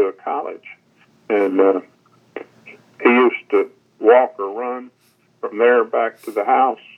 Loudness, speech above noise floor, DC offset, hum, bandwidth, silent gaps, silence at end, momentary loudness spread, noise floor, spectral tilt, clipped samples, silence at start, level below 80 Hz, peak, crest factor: -18 LUFS; 29 dB; under 0.1%; none; 12 kHz; none; 0.2 s; 18 LU; -46 dBFS; -6 dB/octave; under 0.1%; 0 s; -82 dBFS; 0 dBFS; 18 dB